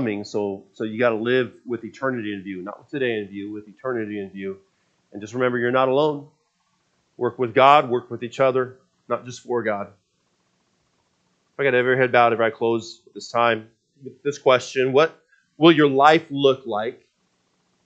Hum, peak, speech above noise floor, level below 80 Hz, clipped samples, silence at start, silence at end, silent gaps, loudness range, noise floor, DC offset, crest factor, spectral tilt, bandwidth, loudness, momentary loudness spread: none; 0 dBFS; 48 dB; -74 dBFS; under 0.1%; 0 s; 0.9 s; none; 9 LU; -69 dBFS; under 0.1%; 22 dB; -5.5 dB/octave; 8.2 kHz; -21 LUFS; 17 LU